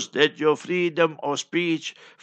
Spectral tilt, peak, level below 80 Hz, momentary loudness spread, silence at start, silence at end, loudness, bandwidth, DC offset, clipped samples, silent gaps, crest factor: -4 dB/octave; -2 dBFS; -78 dBFS; 8 LU; 0 s; 0.3 s; -23 LUFS; 8.8 kHz; under 0.1%; under 0.1%; none; 22 dB